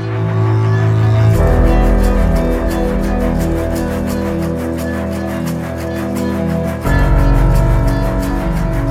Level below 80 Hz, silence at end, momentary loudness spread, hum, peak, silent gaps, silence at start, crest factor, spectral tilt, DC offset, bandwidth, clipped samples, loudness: -18 dBFS; 0 s; 7 LU; none; -2 dBFS; none; 0 s; 12 dB; -7.5 dB/octave; under 0.1%; 15.5 kHz; under 0.1%; -15 LUFS